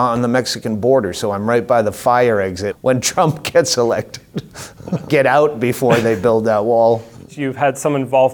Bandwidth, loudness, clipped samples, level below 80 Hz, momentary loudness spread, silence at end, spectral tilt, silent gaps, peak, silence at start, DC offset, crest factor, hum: 20 kHz; -16 LUFS; under 0.1%; -52 dBFS; 11 LU; 0 s; -5 dB/octave; none; 0 dBFS; 0 s; under 0.1%; 16 dB; none